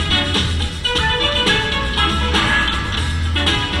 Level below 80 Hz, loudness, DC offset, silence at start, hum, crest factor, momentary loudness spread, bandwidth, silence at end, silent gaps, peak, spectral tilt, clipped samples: -26 dBFS; -16 LUFS; under 0.1%; 0 s; none; 14 dB; 5 LU; 12.5 kHz; 0 s; none; -4 dBFS; -4 dB/octave; under 0.1%